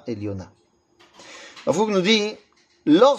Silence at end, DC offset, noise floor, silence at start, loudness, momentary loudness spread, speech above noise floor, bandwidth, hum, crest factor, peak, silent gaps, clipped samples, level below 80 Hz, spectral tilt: 0 s; under 0.1%; -58 dBFS; 0.05 s; -21 LUFS; 23 LU; 38 dB; 9.6 kHz; none; 20 dB; -2 dBFS; none; under 0.1%; -66 dBFS; -5 dB/octave